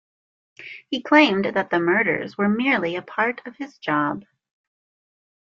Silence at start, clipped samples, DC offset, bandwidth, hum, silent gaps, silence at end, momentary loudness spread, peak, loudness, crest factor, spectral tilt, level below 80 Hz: 0.6 s; under 0.1%; under 0.1%; 7.2 kHz; none; none; 1.25 s; 19 LU; -2 dBFS; -21 LUFS; 22 dB; -6 dB/octave; -68 dBFS